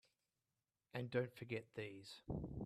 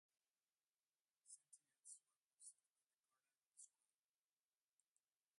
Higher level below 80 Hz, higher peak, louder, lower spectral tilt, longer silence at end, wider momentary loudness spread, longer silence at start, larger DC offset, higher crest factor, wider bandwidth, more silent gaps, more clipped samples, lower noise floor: first, -64 dBFS vs under -90 dBFS; first, -28 dBFS vs -48 dBFS; first, -48 LUFS vs -66 LUFS; first, -7 dB/octave vs 3 dB/octave; second, 0 s vs 1.7 s; first, 9 LU vs 3 LU; second, 0.95 s vs 1.25 s; neither; about the same, 22 dB vs 26 dB; first, 14 kHz vs 11.5 kHz; second, none vs 2.25-2.38 s, 2.70-2.74 s, 2.94-2.98 s, 3.47-3.51 s; neither; about the same, under -90 dBFS vs under -90 dBFS